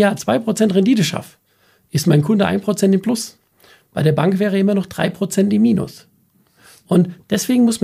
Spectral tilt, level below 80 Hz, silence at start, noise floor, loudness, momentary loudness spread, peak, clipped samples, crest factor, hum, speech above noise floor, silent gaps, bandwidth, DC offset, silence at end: -6 dB/octave; -56 dBFS; 0 s; -57 dBFS; -17 LUFS; 7 LU; 0 dBFS; under 0.1%; 16 dB; none; 42 dB; none; 15.5 kHz; under 0.1%; 0.05 s